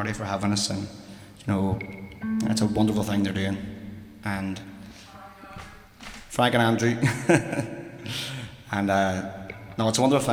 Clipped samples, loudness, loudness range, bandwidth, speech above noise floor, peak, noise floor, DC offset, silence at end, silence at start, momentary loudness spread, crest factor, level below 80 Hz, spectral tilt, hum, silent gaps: under 0.1%; -26 LUFS; 5 LU; 16.5 kHz; 21 dB; -6 dBFS; -45 dBFS; under 0.1%; 0 s; 0 s; 21 LU; 20 dB; -52 dBFS; -5 dB/octave; none; none